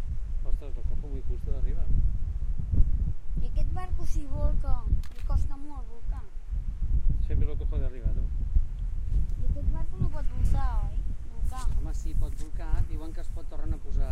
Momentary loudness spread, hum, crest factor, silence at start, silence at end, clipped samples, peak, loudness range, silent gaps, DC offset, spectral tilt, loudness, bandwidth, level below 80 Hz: 9 LU; none; 16 dB; 0 s; 0 s; under 0.1%; -8 dBFS; 2 LU; none; under 0.1%; -8 dB/octave; -34 LUFS; 6.6 kHz; -28 dBFS